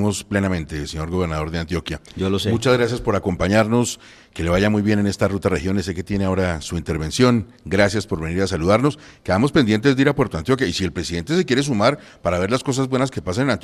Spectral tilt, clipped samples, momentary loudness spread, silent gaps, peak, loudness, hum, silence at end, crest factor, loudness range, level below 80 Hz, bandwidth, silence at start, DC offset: -5.5 dB/octave; under 0.1%; 8 LU; none; -2 dBFS; -20 LUFS; none; 0 s; 18 dB; 2 LU; -42 dBFS; 14.5 kHz; 0 s; under 0.1%